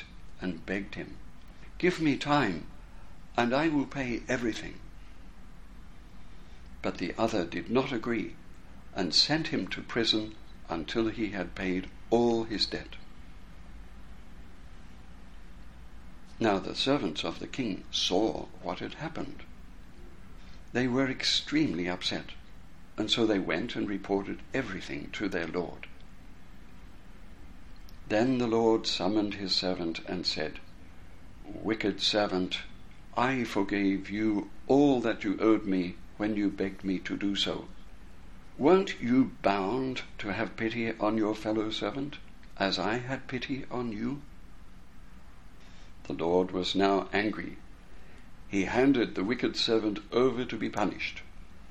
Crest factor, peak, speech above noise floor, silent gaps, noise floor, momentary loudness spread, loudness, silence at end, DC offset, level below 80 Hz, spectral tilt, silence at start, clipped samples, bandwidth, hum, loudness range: 22 dB; -10 dBFS; 21 dB; none; -51 dBFS; 14 LU; -30 LUFS; 0 s; 0.5%; -52 dBFS; -5 dB/octave; 0 s; under 0.1%; 11.5 kHz; none; 7 LU